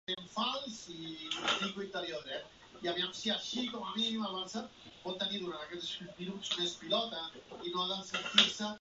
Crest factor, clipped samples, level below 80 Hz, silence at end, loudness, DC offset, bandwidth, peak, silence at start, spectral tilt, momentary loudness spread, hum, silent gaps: 30 dB; under 0.1%; -72 dBFS; 0 s; -35 LUFS; under 0.1%; 8 kHz; -8 dBFS; 0.1 s; -1 dB/octave; 13 LU; none; none